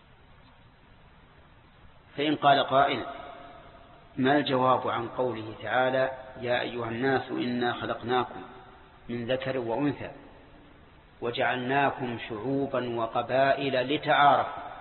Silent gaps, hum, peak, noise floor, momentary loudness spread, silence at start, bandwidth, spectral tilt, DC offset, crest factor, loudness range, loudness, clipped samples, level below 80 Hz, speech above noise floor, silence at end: none; none; -10 dBFS; -55 dBFS; 16 LU; 2.15 s; 4.3 kHz; -9.5 dB/octave; under 0.1%; 20 dB; 5 LU; -27 LUFS; under 0.1%; -60 dBFS; 28 dB; 0 s